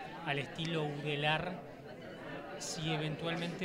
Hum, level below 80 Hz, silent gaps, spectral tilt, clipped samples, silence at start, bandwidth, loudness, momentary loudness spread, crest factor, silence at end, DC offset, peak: none; -66 dBFS; none; -4.5 dB/octave; under 0.1%; 0 s; 15.5 kHz; -37 LUFS; 14 LU; 20 dB; 0 s; under 0.1%; -18 dBFS